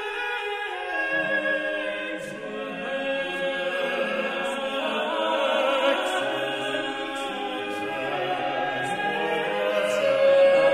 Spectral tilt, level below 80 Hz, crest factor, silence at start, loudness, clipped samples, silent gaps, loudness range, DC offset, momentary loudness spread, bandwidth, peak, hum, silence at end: -3.5 dB/octave; -64 dBFS; 16 dB; 0 s; -25 LUFS; under 0.1%; none; 3 LU; under 0.1%; 8 LU; 13.5 kHz; -10 dBFS; none; 0 s